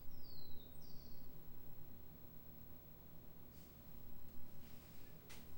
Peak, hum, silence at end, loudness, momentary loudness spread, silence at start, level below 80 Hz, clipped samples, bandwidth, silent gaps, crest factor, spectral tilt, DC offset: -34 dBFS; none; 0 s; -59 LUFS; 2 LU; 0 s; -62 dBFS; under 0.1%; 16 kHz; none; 12 dB; -5 dB/octave; under 0.1%